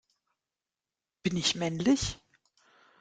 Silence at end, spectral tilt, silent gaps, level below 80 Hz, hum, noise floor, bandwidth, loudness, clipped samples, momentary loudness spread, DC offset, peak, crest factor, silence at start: 0.85 s; -4 dB/octave; none; -56 dBFS; none; under -90 dBFS; 9.6 kHz; -29 LUFS; under 0.1%; 9 LU; under 0.1%; -14 dBFS; 20 dB; 1.25 s